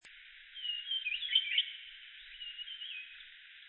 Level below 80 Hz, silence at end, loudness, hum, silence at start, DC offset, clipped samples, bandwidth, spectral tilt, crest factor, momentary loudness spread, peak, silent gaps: -76 dBFS; 0 s; -35 LUFS; none; 0.05 s; under 0.1%; under 0.1%; 4.2 kHz; 9 dB/octave; 24 dB; 21 LU; -16 dBFS; none